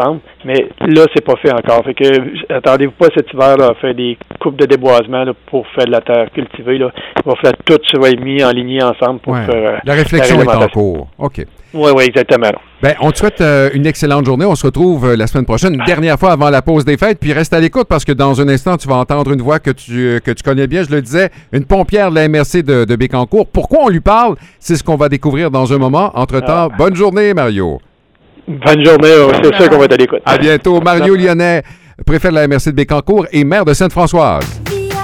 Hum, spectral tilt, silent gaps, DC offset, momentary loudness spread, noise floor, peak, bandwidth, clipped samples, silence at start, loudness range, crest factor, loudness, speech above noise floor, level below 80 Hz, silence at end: none; -6 dB/octave; none; 0.1%; 8 LU; -47 dBFS; 0 dBFS; 16.5 kHz; 0.5%; 0 s; 4 LU; 10 dB; -10 LUFS; 37 dB; -28 dBFS; 0 s